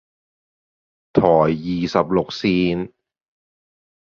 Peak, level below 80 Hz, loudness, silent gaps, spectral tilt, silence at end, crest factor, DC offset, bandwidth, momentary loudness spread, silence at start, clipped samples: -2 dBFS; -50 dBFS; -19 LUFS; none; -7.5 dB/octave; 1.15 s; 20 dB; under 0.1%; 7.2 kHz; 7 LU; 1.15 s; under 0.1%